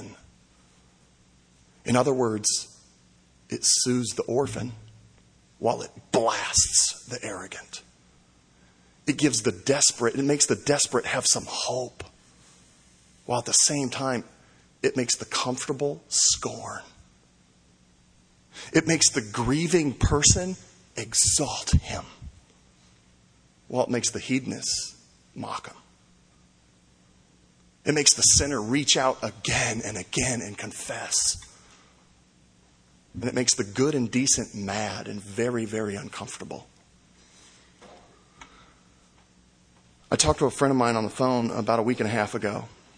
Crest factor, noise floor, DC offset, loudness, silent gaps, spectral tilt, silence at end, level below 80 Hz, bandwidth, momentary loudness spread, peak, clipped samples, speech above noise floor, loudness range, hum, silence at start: 24 dB; -60 dBFS; under 0.1%; -24 LUFS; none; -3 dB/octave; 0.3 s; -46 dBFS; 10.5 kHz; 17 LU; -2 dBFS; under 0.1%; 34 dB; 8 LU; none; 0 s